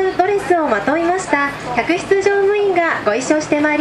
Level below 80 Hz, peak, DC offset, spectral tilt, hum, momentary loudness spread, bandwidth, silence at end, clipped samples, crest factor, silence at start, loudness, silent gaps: -48 dBFS; 0 dBFS; under 0.1%; -4.5 dB/octave; none; 3 LU; 12 kHz; 0 s; under 0.1%; 14 dB; 0 s; -16 LUFS; none